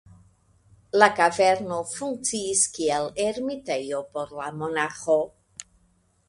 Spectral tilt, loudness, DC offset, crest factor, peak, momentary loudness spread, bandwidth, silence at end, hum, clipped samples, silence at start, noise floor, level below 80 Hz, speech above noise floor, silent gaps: -2.5 dB/octave; -24 LUFS; under 0.1%; 24 dB; -2 dBFS; 14 LU; 11.5 kHz; 0.65 s; none; under 0.1%; 0.95 s; -65 dBFS; -62 dBFS; 40 dB; none